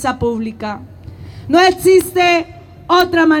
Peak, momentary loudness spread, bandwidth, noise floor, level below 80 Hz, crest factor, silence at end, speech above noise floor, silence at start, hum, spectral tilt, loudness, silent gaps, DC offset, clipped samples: 0 dBFS; 20 LU; 18 kHz; -33 dBFS; -42 dBFS; 14 dB; 0 s; 20 dB; 0 s; none; -4.5 dB/octave; -13 LUFS; none; under 0.1%; under 0.1%